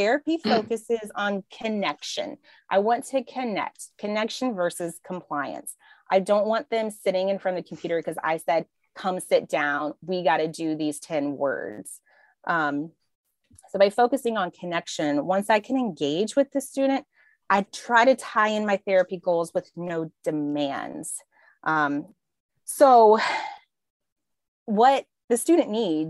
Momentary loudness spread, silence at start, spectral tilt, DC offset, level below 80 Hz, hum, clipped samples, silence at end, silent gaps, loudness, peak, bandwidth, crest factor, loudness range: 13 LU; 0 s; -4.5 dB/octave; under 0.1%; -76 dBFS; none; under 0.1%; 0 s; 13.15-13.24 s, 22.40-22.49 s, 23.90-24.00 s, 24.12-24.16 s, 24.48-24.66 s, 25.24-25.28 s; -25 LUFS; -6 dBFS; 13 kHz; 20 dB; 6 LU